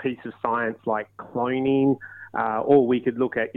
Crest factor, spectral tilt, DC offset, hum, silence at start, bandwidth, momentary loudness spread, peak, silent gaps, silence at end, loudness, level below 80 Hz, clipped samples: 16 dB; -9.5 dB/octave; under 0.1%; none; 0 s; 4 kHz; 11 LU; -6 dBFS; none; 0.05 s; -24 LUFS; -64 dBFS; under 0.1%